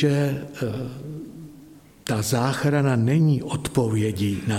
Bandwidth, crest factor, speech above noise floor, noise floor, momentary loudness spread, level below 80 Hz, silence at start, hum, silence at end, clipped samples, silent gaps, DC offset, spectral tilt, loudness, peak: 16 kHz; 16 dB; 25 dB; -48 dBFS; 16 LU; -52 dBFS; 0 s; none; 0 s; under 0.1%; none; under 0.1%; -6.5 dB/octave; -23 LUFS; -8 dBFS